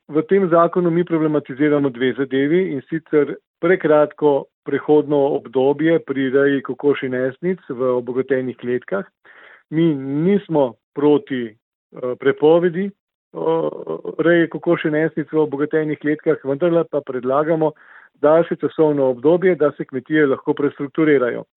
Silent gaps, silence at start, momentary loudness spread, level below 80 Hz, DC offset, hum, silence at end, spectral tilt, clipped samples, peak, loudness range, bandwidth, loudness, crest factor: 3.47-3.54 s, 4.54-4.62 s, 10.84-10.92 s, 11.62-11.90 s, 13.00-13.07 s, 13.15-13.31 s; 0.1 s; 9 LU; -68 dBFS; under 0.1%; none; 0.15 s; -11.5 dB/octave; under 0.1%; -2 dBFS; 3 LU; 4 kHz; -18 LUFS; 16 dB